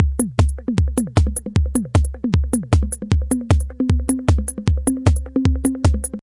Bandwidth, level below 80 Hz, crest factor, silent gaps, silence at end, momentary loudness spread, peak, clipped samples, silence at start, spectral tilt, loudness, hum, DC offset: 11.5 kHz; -24 dBFS; 18 dB; none; 0 s; 2 LU; 0 dBFS; under 0.1%; 0 s; -6.5 dB/octave; -19 LUFS; none; under 0.1%